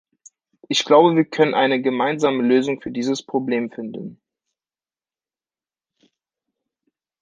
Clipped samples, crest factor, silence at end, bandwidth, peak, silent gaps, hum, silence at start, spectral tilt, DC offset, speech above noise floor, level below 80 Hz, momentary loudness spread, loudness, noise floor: under 0.1%; 20 dB; 3.1 s; 9.8 kHz; -2 dBFS; none; none; 0.7 s; -5 dB/octave; under 0.1%; over 71 dB; -68 dBFS; 16 LU; -19 LUFS; under -90 dBFS